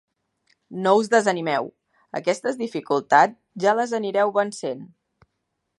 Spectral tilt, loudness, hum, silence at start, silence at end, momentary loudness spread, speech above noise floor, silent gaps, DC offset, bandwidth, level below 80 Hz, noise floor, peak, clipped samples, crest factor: -4.5 dB/octave; -22 LUFS; none; 0.7 s; 0.95 s; 14 LU; 56 dB; none; under 0.1%; 11.5 kHz; -76 dBFS; -77 dBFS; -2 dBFS; under 0.1%; 22 dB